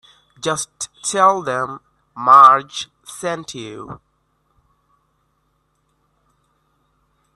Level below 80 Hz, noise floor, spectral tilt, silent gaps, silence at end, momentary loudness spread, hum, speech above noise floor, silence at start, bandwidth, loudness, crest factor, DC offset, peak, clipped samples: -62 dBFS; -66 dBFS; -2.5 dB/octave; none; 3.4 s; 24 LU; none; 50 dB; 0.45 s; 12.5 kHz; -16 LUFS; 20 dB; under 0.1%; 0 dBFS; under 0.1%